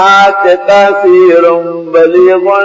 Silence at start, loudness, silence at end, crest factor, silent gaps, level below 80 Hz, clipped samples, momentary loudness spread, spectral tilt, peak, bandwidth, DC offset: 0 s; -6 LUFS; 0 s; 6 dB; none; -54 dBFS; 3%; 5 LU; -5 dB/octave; 0 dBFS; 7.6 kHz; under 0.1%